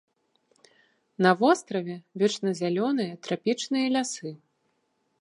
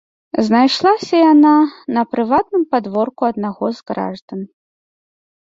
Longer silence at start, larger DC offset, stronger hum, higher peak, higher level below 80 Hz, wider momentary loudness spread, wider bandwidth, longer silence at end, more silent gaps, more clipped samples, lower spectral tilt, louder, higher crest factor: first, 1.2 s vs 0.35 s; neither; neither; second, -6 dBFS vs -2 dBFS; second, -82 dBFS vs -58 dBFS; second, 11 LU vs 14 LU; first, 11 kHz vs 7.8 kHz; about the same, 0.85 s vs 0.95 s; second, none vs 4.22-4.28 s; neither; about the same, -5 dB/octave vs -6 dB/octave; second, -26 LUFS vs -15 LUFS; first, 22 dB vs 14 dB